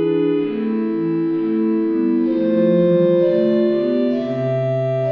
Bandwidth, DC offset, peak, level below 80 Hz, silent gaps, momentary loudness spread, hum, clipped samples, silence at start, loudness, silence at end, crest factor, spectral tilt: 5.2 kHz; under 0.1%; -6 dBFS; -62 dBFS; none; 6 LU; none; under 0.1%; 0 s; -18 LUFS; 0 s; 12 dB; -10 dB/octave